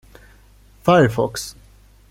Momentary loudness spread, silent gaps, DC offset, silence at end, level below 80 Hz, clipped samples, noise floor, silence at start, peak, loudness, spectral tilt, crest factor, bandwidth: 16 LU; none; under 0.1%; 0.6 s; -48 dBFS; under 0.1%; -49 dBFS; 0.85 s; -2 dBFS; -18 LUFS; -6 dB/octave; 20 dB; 16.5 kHz